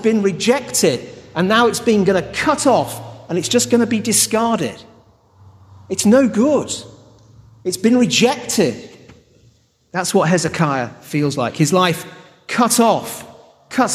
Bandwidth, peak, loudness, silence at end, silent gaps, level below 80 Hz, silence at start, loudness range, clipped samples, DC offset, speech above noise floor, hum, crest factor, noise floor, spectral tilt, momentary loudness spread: 14.5 kHz; -2 dBFS; -16 LUFS; 0 s; none; -54 dBFS; 0 s; 3 LU; under 0.1%; under 0.1%; 38 dB; none; 16 dB; -54 dBFS; -4 dB/octave; 13 LU